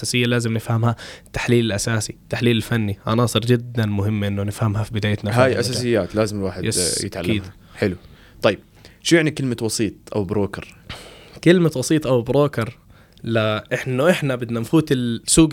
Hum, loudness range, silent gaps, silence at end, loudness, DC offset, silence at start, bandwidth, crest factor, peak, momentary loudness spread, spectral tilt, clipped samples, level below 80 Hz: none; 2 LU; none; 0 s; -20 LUFS; under 0.1%; 0 s; 16.5 kHz; 18 dB; -2 dBFS; 10 LU; -5 dB/octave; under 0.1%; -46 dBFS